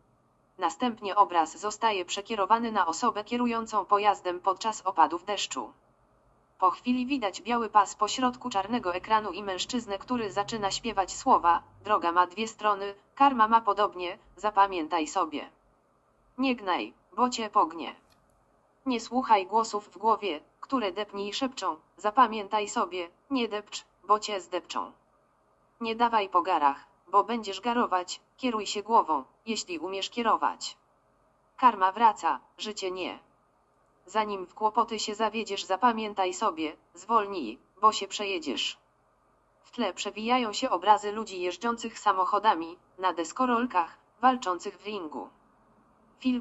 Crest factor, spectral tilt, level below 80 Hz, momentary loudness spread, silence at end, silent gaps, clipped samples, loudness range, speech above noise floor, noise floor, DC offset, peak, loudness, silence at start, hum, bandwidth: 20 dB; -2.5 dB/octave; -66 dBFS; 12 LU; 0 s; none; under 0.1%; 4 LU; 39 dB; -67 dBFS; under 0.1%; -8 dBFS; -28 LUFS; 0.6 s; none; 8.2 kHz